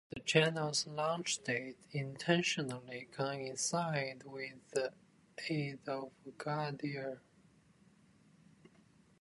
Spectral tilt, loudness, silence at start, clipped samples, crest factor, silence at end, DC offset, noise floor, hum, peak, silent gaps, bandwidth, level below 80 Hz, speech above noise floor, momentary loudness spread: -4 dB/octave; -37 LUFS; 0.1 s; under 0.1%; 26 dB; 2 s; under 0.1%; -67 dBFS; none; -14 dBFS; none; 11.5 kHz; -78 dBFS; 29 dB; 13 LU